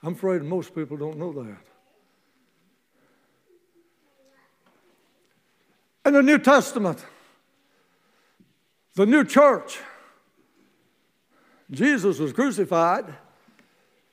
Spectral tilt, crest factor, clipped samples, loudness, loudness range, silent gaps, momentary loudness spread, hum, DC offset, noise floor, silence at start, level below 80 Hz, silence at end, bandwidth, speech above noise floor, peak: -5.5 dB/octave; 24 dB; under 0.1%; -21 LUFS; 11 LU; none; 21 LU; none; under 0.1%; -68 dBFS; 0.05 s; -76 dBFS; 1 s; 15.5 kHz; 47 dB; -2 dBFS